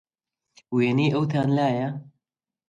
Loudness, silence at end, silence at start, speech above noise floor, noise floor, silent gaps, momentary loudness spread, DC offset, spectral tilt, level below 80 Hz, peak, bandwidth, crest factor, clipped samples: -24 LUFS; 0.6 s; 0.7 s; 64 dB; -87 dBFS; none; 9 LU; under 0.1%; -8 dB/octave; -66 dBFS; -10 dBFS; 7.8 kHz; 14 dB; under 0.1%